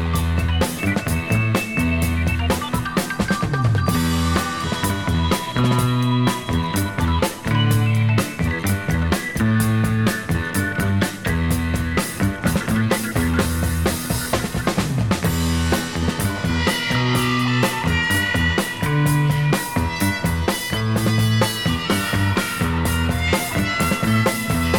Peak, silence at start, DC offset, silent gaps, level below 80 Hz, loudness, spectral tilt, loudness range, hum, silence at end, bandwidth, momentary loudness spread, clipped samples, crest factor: -4 dBFS; 0 s; 0.3%; none; -32 dBFS; -20 LUFS; -5 dB/octave; 2 LU; none; 0 s; 19 kHz; 4 LU; under 0.1%; 16 dB